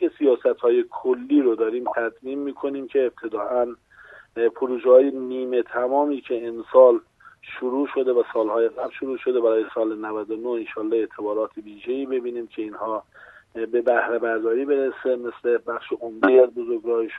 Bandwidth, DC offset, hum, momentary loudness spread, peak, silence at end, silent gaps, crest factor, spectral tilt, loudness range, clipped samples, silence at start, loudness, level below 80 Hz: 4 kHz; under 0.1%; none; 14 LU; -2 dBFS; 0 s; none; 20 dB; -7 dB/octave; 7 LU; under 0.1%; 0 s; -22 LUFS; -70 dBFS